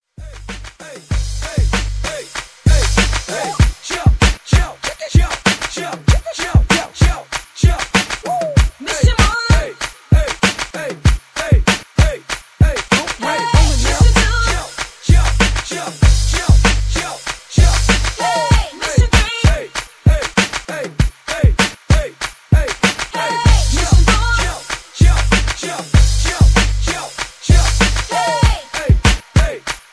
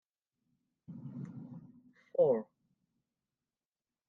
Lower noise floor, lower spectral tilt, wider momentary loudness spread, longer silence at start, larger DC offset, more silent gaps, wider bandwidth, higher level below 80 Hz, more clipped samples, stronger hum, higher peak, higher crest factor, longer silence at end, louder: second, -34 dBFS vs under -90 dBFS; second, -4.5 dB/octave vs -10 dB/octave; second, 11 LU vs 23 LU; second, 0.2 s vs 0.9 s; neither; neither; first, 11 kHz vs 3.2 kHz; first, -18 dBFS vs -86 dBFS; neither; neither; first, 0 dBFS vs -18 dBFS; second, 14 dB vs 22 dB; second, 0.15 s vs 1.65 s; first, -16 LUFS vs -34 LUFS